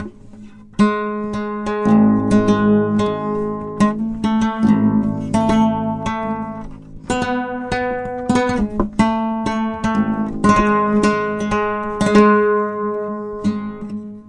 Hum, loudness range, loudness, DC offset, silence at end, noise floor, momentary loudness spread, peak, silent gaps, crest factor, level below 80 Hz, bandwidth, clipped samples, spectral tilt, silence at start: none; 4 LU; -18 LUFS; under 0.1%; 0 s; -38 dBFS; 10 LU; 0 dBFS; none; 16 dB; -38 dBFS; 11 kHz; under 0.1%; -6.5 dB/octave; 0 s